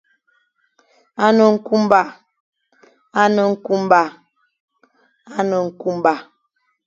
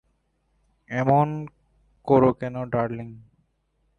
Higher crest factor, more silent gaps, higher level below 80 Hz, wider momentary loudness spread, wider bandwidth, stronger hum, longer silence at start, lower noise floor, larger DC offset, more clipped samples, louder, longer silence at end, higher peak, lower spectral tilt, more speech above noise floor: about the same, 18 dB vs 20 dB; first, 2.40-2.53 s, 4.60-4.68 s vs none; second, -64 dBFS vs -56 dBFS; second, 12 LU vs 20 LU; first, 7.6 kHz vs 6.8 kHz; neither; first, 1.2 s vs 0.9 s; about the same, -68 dBFS vs -70 dBFS; neither; neither; first, -17 LUFS vs -23 LUFS; second, 0.65 s vs 0.8 s; first, 0 dBFS vs -4 dBFS; second, -6 dB/octave vs -9.5 dB/octave; first, 53 dB vs 48 dB